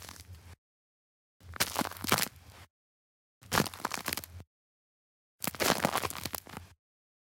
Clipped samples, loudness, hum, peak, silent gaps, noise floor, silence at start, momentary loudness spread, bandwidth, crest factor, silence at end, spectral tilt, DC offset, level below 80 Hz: under 0.1%; -32 LUFS; none; -12 dBFS; 0.58-1.40 s, 2.70-3.41 s, 4.47-5.39 s; under -90 dBFS; 0 s; 21 LU; 17 kHz; 26 dB; 0.7 s; -2.5 dB/octave; under 0.1%; -60 dBFS